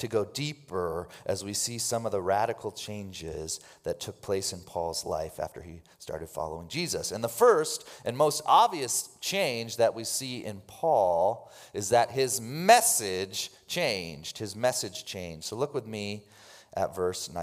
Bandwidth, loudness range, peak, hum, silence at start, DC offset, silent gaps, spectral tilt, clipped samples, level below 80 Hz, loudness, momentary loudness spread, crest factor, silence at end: 16 kHz; 8 LU; -6 dBFS; none; 0 s; under 0.1%; none; -3 dB/octave; under 0.1%; -64 dBFS; -29 LUFS; 16 LU; 22 dB; 0 s